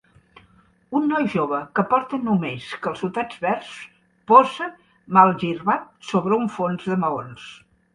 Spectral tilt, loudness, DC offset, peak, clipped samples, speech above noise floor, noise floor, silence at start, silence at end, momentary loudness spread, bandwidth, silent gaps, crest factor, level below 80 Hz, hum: -7 dB/octave; -21 LUFS; under 0.1%; 0 dBFS; under 0.1%; 36 dB; -57 dBFS; 0.9 s; 0.4 s; 15 LU; 10.5 kHz; none; 22 dB; -62 dBFS; none